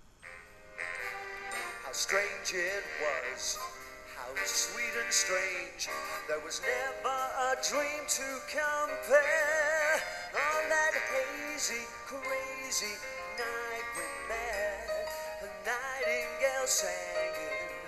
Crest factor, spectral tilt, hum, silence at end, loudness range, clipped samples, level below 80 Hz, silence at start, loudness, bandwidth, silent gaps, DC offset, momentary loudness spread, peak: 20 dB; 0 dB/octave; none; 0 s; 6 LU; under 0.1%; -62 dBFS; 0.05 s; -32 LUFS; 13 kHz; none; under 0.1%; 11 LU; -14 dBFS